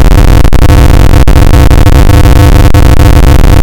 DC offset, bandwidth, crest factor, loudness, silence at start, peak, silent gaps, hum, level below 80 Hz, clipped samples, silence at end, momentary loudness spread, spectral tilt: under 0.1%; 17.5 kHz; 0 dB; -4 LUFS; 0 s; 0 dBFS; none; none; -2 dBFS; 50%; 0 s; 1 LU; -6.5 dB/octave